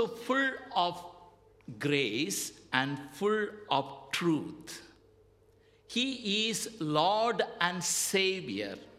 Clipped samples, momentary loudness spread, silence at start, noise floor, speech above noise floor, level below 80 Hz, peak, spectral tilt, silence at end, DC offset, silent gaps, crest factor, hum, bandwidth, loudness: under 0.1%; 10 LU; 0 s; -64 dBFS; 32 dB; -72 dBFS; -8 dBFS; -3 dB/octave; 0 s; under 0.1%; none; 24 dB; none; 16 kHz; -31 LUFS